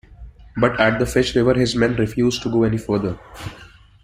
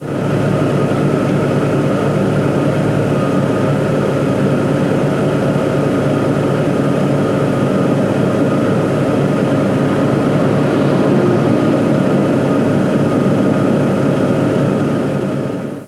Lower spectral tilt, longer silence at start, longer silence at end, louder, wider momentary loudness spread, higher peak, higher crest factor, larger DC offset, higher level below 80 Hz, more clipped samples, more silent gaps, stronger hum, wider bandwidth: second, -6 dB/octave vs -8 dB/octave; about the same, 0.1 s vs 0 s; first, 0.4 s vs 0 s; second, -19 LUFS vs -14 LUFS; first, 16 LU vs 2 LU; about the same, -2 dBFS vs 0 dBFS; about the same, 18 dB vs 14 dB; neither; about the same, -40 dBFS vs -42 dBFS; neither; neither; neither; first, 16 kHz vs 13 kHz